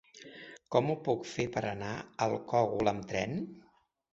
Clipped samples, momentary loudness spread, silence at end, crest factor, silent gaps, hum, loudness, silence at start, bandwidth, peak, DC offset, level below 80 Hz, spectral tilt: under 0.1%; 17 LU; 0.55 s; 22 dB; none; none; -33 LUFS; 0.15 s; 8 kHz; -12 dBFS; under 0.1%; -64 dBFS; -6 dB/octave